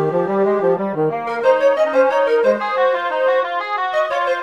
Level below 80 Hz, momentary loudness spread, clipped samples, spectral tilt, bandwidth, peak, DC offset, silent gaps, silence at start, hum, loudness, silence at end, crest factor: -68 dBFS; 5 LU; under 0.1%; -6 dB/octave; 8 kHz; -2 dBFS; 0.2%; none; 0 s; none; -17 LUFS; 0 s; 14 dB